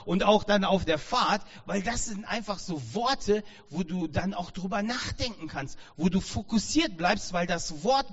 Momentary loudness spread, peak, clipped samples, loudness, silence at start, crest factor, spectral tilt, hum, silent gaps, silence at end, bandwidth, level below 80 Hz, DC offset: 10 LU; -8 dBFS; under 0.1%; -29 LUFS; 0 s; 20 dB; -4 dB/octave; none; none; 0 s; 8 kHz; -46 dBFS; under 0.1%